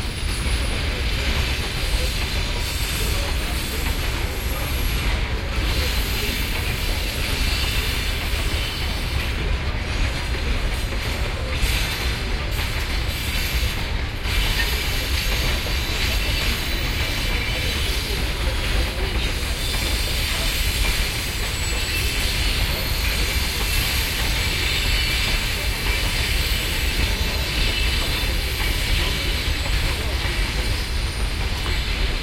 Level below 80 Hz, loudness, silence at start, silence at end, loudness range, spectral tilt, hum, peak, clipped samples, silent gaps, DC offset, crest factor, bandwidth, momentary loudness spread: -24 dBFS; -23 LUFS; 0 s; 0 s; 3 LU; -3 dB/octave; none; -8 dBFS; under 0.1%; none; under 0.1%; 14 dB; 16.5 kHz; 4 LU